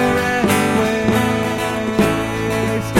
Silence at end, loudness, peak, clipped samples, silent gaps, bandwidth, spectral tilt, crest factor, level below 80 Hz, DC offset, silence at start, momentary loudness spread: 0 s; -17 LUFS; -2 dBFS; under 0.1%; none; 17 kHz; -5 dB/octave; 14 dB; -38 dBFS; under 0.1%; 0 s; 4 LU